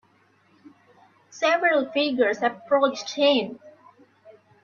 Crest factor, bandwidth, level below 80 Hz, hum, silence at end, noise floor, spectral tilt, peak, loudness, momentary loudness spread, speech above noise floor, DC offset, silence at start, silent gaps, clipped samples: 18 dB; 7.2 kHz; -74 dBFS; none; 0.35 s; -62 dBFS; -3 dB/octave; -8 dBFS; -22 LUFS; 6 LU; 39 dB; under 0.1%; 1.35 s; none; under 0.1%